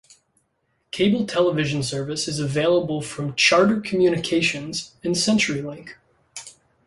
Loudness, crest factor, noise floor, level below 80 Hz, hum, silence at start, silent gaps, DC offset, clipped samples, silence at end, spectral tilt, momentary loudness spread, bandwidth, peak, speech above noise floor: -21 LUFS; 18 dB; -70 dBFS; -58 dBFS; none; 0.95 s; none; under 0.1%; under 0.1%; 0.35 s; -4.5 dB/octave; 17 LU; 11.5 kHz; -4 dBFS; 49 dB